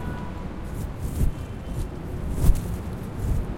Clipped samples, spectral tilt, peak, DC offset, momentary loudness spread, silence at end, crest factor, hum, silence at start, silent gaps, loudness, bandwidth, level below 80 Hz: under 0.1%; -7 dB/octave; -4 dBFS; under 0.1%; 9 LU; 0 s; 22 dB; none; 0 s; none; -30 LUFS; 16.5 kHz; -28 dBFS